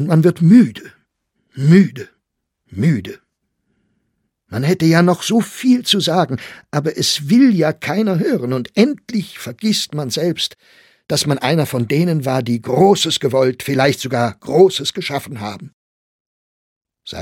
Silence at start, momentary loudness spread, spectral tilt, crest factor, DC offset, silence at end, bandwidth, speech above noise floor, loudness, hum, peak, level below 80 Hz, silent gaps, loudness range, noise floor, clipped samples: 0 s; 12 LU; -5.5 dB/octave; 16 dB; under 0.1%; 0 s; 16.5 kHz; 59 dB; -16 LUFS; none; 0 dBFS; -58 dBFS; 15.73-16.81 s; 4 LU; -74 dBFS; under 0.1%